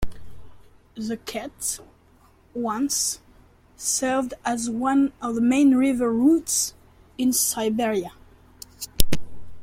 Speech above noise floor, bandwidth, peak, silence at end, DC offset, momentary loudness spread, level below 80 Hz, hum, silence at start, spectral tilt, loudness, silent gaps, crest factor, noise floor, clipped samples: 33 dB; 16.5 kHz; 0 dBFS; 0 s; under 0.1%; 18 LU; -40 dBFS; none; 0 s; -3 dB/octave; -23 LUFS; none; 24 dB; -56 dBFS; under 0.1%